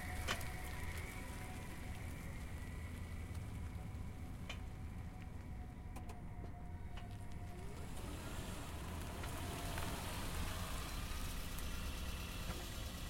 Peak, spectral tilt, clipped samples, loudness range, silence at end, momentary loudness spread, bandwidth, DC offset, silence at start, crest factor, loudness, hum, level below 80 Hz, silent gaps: -26 dBFS; -4.5 dB/octave; under 0.1%; 5 LU; 0 s; 7 LU; 16.5 kHz; under 0.1%; 0 s; 20 dB; -47 LUFS; none; -50 dBFS; none